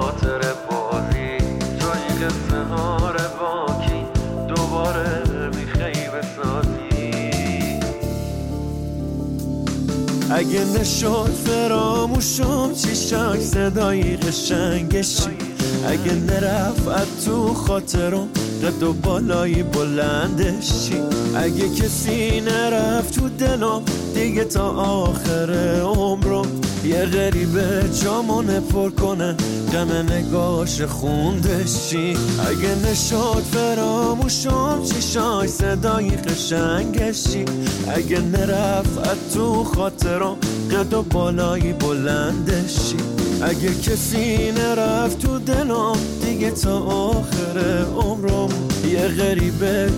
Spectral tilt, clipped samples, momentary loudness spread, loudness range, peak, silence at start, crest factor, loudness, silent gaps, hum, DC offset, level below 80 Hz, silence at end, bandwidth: -5 dB/octave; under 0.1%; 4 LU; 3 LU; -8 dBFS; 0 s; 10 dB; -20 LUFS; none; none; under 0.1%; -30 dBFS; 0 s; 17 kHz